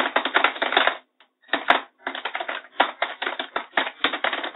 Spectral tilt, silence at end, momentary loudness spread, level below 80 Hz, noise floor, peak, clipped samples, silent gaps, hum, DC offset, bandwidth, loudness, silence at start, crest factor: -3.5 dB/octave; 0 s; 10 LU; -72 dBFS; -58 dBFS; 0 dBFS; under 0.1%; none; none; under 0.1%; 8.4 kHz; -24 LUFS; 0 s; 26 dB